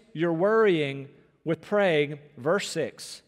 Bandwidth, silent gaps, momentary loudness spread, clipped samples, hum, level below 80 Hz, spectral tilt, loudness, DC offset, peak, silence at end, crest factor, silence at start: 14 kHz; none; 11 LU; under 0.1%; none; -76 dBFS; -5.5 dB/octave; -26 LUFS; under 0.1%; -12 dBFS; 0.1 s; 14 dB; 0.15 s